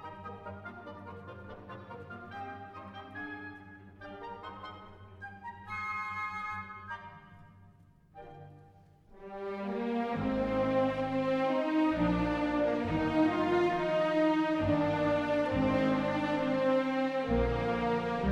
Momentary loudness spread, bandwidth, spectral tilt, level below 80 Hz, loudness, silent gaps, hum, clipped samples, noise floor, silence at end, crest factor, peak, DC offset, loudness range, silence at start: 19 LU; 9 kHz; -7.5 dB/octave; -50 dBFS; -31 LUFS; none; none; under 0.1%; -60 dBFS; 0 s; 16 dB; -16 dBFS; under 0.1%; 16 LU; 0 s